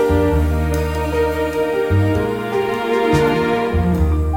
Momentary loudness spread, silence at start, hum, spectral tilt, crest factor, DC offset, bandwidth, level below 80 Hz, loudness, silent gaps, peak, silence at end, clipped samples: 4 LU; 0 s; none; -7 dB/octave; 14 dB; under 0.1%; 17 kHz; -24 dBFS; -18 LUFS; none; -2 dBFS; 0 s; under 0.1%